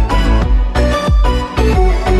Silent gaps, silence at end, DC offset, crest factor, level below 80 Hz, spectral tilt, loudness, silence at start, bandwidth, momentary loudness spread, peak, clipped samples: none; 0 s; under 0.1%; 10 dB; -12 dBFS; -6.5 dB/octave; -14 LUFS; 0 s; 11.5 kHz; 2 LU; 0 dBFS; under 0.1%